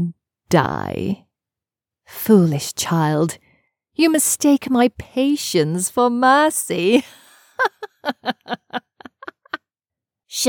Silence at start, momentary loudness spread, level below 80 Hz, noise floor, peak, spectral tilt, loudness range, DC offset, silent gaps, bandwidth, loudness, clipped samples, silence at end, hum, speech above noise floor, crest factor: 0 s; 18 LU; -58 dBFS; -88 dBFS; 0 dBFS; -4.5 dB/octave; 7 LU; under 0.1%; none; over 20 kHz; -19 LUFS; under 0.1%; 0 s; none; 71 dB; 20 dB